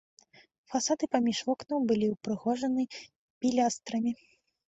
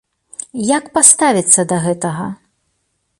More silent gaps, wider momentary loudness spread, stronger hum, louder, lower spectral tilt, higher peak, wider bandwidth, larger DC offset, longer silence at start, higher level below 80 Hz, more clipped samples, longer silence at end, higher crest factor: first, 3.16-3.41 s vs none; second, 7 LU vs 20 LU; neither; second, -30 LUFS vs -12 LUFS; about the same, -4 dB/octave vs -3.5 dB/octave; second, -14 dBFS vs 0 dBFS; second, 8.2 kHz vs 16 kHz; neither; first, 0.7 s vs 0.55 s; second, -70 dBFS vs -56 dBFS; second, under 0.1% vs 0.3%; second, 0.55 s vs 0.85 s; about the same, 18 dB vs 16 dB